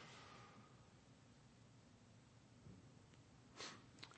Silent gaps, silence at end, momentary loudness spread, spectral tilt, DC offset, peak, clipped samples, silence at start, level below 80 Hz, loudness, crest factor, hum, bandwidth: none; 0 s; 13 LU; -3.5 dB/octave; under 0.1%; -34 dBFS; under 0.1%; 0 s; -80 dBFS; -62 LUFS; 30 dB; none; 8.4 kHz